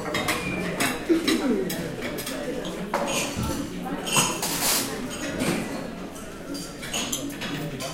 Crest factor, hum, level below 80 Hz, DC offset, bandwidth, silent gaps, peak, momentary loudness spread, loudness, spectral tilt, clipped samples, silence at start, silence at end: 20 dB; none; -46 dBFS; under 0.1%; 16.5 kHz; none; -6 dBFS; 11 LU; -27 LUFS; -3 dB/octave; under 0.1%; 0 s; 0 s